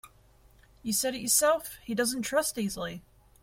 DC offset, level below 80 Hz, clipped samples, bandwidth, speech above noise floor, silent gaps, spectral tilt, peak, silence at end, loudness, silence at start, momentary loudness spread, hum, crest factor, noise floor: under 0.1%; -60 dBFS; under 0.1%; 16.5 kHz; 30 dB; none; -2.5 dB/octave; -10 dBFS; 0.4 s; -28 LUFS; 0.05 s; 15 LU; none; 22 dB; -60 dBFS